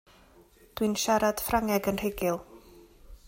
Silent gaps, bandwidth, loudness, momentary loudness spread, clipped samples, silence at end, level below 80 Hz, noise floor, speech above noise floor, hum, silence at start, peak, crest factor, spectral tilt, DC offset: none; 16.5 kHz; -28 LUFS; 7 LU; under 0.1%; 0 s; -50 dBFS; -58 dBFS; 30 dB; none; 0.75 s; -12 dBFS; 18 dB; -4 dB/octave; under 0.1%